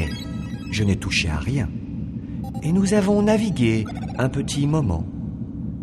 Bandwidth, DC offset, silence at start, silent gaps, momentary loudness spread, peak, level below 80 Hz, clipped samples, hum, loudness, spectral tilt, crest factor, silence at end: 12.5 kHz; under 0.1%; 0 s; none; 12 LU; -6 dBFS; -36 dBFS; under 0.1%; none; -23 LUFS; -6 dB/octave; 16 dB; 0 s